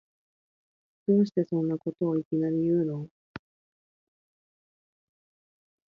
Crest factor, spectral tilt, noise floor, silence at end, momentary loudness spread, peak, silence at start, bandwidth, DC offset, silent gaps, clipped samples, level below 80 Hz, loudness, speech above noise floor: 18 dB; -10.5 dB/octave; under -90 dBFS; 2.55 s; 20 LU; -12 dBFS; 1.1 s; 6.6 kHz; under 0.1%; 2.25-2.31 s, 3.11-3.34 s; under 0.1%; -72 dBFS; -28 LUFS; over 64 dB